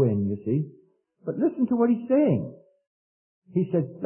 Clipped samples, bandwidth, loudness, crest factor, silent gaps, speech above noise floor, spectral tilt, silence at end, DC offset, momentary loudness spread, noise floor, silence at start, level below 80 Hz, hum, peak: under 0.1%; 3.1 kHz; -25 LUFS; 16 dB; 2.87-3.42 s; over 66 dB; -13.5 dB/octave; 0 s; under 0.1%; 13 LU; under -90 dBFS; 0 s; -68 dBFS; none; -10 dBFS